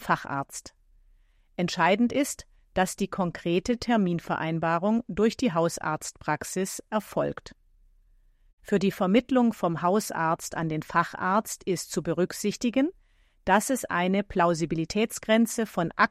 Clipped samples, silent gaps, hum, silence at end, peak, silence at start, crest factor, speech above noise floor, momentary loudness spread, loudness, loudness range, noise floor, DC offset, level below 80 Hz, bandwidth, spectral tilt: under 0.1%; 8.53-8.58 s; none; 0.05 s; -6 dBFS; 0 s; 20 dB; 35 dB; 8 LU; -27 LUFS; 3 LU; -61 dBFS; under 0.1%; -56 dBFS; 15.5 kHz; -5 dB/octave